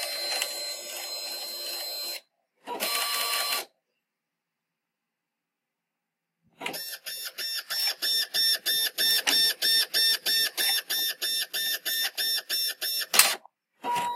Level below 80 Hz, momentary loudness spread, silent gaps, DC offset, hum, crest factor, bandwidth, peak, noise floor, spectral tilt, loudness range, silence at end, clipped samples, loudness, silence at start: -84 dBFS; 14 LU; none; under 0.1%; none; 30 dB; 16 kHz; 0 dBFS; -85 dBFS; 2 dB/octave; 14 LU; 0 s; under 0.1%; -25 LUFS; 0 s